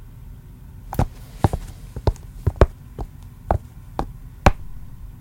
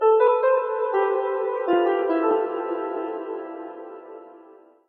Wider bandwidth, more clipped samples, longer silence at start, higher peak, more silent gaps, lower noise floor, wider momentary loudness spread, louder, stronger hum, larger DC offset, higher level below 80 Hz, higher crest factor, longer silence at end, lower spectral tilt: first, 17 kHz vs 4.3 kHz; neither; about the same, 0 s vs 0 s; first, 0 dBFS vs -6 dBFS; neither; second, -40 dBFS vs -50 dBFS; about the same, 21 LU vs 21 LU; about the same, -24 LUFS vs -23 LUFS; neither; neither; first, -28 dBFS vs under -90 dBFS; first, 24 dB vs 16 dB; second, 0 s vs 0.35 s; first, -7 dB/octave vs -2 dB/octave